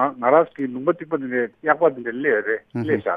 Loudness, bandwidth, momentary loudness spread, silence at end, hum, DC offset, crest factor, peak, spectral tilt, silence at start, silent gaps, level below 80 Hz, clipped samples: -21 LUFS; 4.8 kHz; 8 LU; 0 s; none; under 0.1%; 20 dB; -2 dBFS; -9.5 dB/octave; 0 s; none; -68 dBFS; under 0.1%